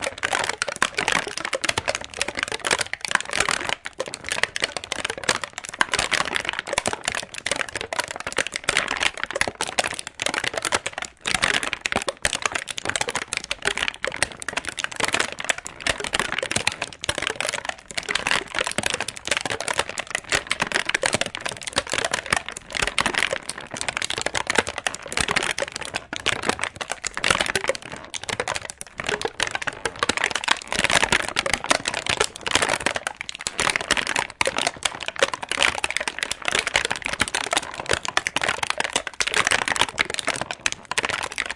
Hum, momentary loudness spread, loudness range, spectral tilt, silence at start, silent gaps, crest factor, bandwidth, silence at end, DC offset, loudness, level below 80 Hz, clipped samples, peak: none; 7 LU; 3 LU; -1 dB/octave; 0 s; none; 26 dB; 11.5 kHz; 0 s; under 0.1%; -24 LUFS; -50 dBFS; under 0.1%; 0 dBFS